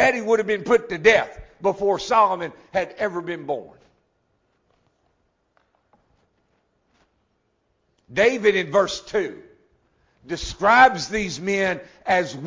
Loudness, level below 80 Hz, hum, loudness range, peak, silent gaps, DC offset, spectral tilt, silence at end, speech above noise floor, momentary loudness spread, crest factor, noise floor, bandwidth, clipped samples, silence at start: -21 LUFS; -52 dBFS; none; 13 LU; -2 dBFS; none; under 0.1%; -4 dB/octave; 0 s; 49 dB; 13 LU; 22 dB; -70 dBFS; 7.6 kHz; under 0.1%; 0 s